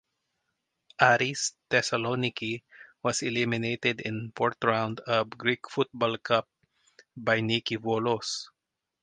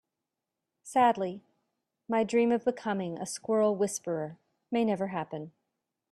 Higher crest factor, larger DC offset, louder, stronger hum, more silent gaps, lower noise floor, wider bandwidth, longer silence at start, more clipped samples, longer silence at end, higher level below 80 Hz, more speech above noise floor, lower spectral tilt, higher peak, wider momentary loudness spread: first, 24 dB vs 18 dB; neither; about the same, -28 LUFS vs -30 LUFS; neither; neither; about the same, -86 dBFS vs -87 dBFS; second, 10.5 kHz vs 13 kHz; first, 1 s vs 0.85 s; neither; about the same, 0.55 s vs 0.65 s; first, -68 dBFS vs -76 dBFS; about the same, 58 dB vs 58 dB; about the same, -4 dB/octave vs -5 dB/octave; first, -4 dBFS vs -12 dBFS; second, 9 LU vs 13 LU